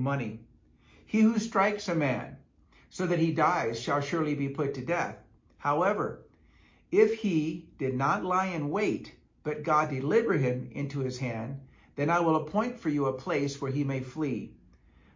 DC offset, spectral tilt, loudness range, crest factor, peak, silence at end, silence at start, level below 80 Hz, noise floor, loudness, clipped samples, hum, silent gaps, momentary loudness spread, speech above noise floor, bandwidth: under 0.1%; -6.5 dB/octave; 2 LU; 20 dB; -10 dBFS; 0.6 s; 0 s; -62 dBFS; -61 dBFS; -29 LUFS; under 0.1%; none; none; 12 LU; 32 dB; 7.6 kHz